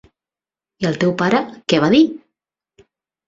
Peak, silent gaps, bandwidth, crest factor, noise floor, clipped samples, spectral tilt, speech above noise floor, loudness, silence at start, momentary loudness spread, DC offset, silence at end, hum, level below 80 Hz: 0 dBFS; none; 7.8 kHz; 18 dB; under -90 dBFS; under 0.1%; -6 dB/octave; over 74 dB; -17 LUFS; 0.8 s; 10 LU; under 0.1%; 1.1 s; none; -56 dBFS